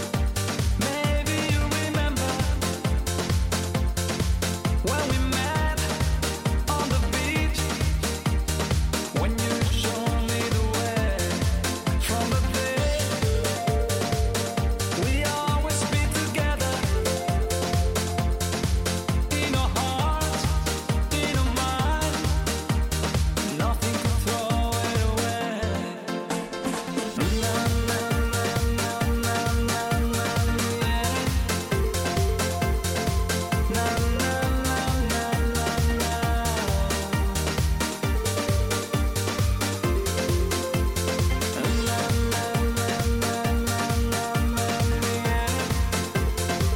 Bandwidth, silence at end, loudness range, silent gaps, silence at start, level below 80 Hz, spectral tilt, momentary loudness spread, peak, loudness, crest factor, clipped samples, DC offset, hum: 17 kHz; 0 s; 1 LU; none; 0 s; -30 dBFS; -4.5 dB/octave; 2 LU; -12 dBFS; -25 LUFS; 12 dB; under 0.1%; under 0.1%; none